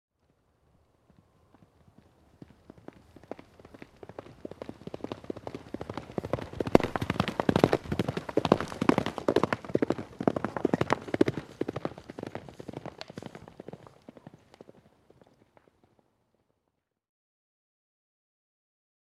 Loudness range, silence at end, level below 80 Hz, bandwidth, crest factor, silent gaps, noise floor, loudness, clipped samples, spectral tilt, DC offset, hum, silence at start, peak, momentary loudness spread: 21 LU; 5.25 s; -56 dBFS; 14.5 kHz; 32 dB; none; -81 dBFS; -31 LUFS; under 0.1%; -6.5 dB/octave; under 0.1%; none; 4.1 s; -2 dBFS; 23 LU